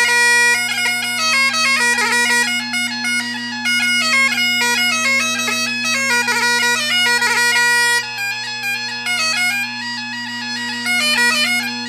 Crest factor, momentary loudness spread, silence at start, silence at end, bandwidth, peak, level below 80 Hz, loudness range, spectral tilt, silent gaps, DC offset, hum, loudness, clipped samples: 14 dB; 9 LU; 0 s; 0 s; 16 kHz; -2 dBFS; -66 dBFS; 3 LU; 0 dB/octave; none; under 0.1%; none; -15 LUFS; under 0.1%